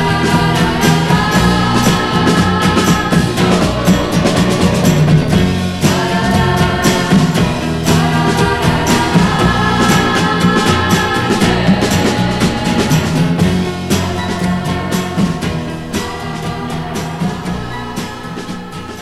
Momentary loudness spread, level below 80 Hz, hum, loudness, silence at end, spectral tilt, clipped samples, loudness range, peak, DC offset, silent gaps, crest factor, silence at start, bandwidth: 10 LU; -30 dBFS; none; -13 LUFS; 0 s; -5 dB/octave; under 0.1%; 7 LU; 0 dBFS; under 0.1%; none; 12 dB; 0 s; 15 kHz